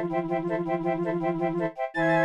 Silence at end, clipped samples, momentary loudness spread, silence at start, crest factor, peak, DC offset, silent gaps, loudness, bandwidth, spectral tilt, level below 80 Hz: 0 s; under 0.1%; 2 LU; 0 s; 14 dB; -12 dBFS; 0.1%; none; -28 LUFS; 8.8 kHz; -8 dB/octave; -62 dBFS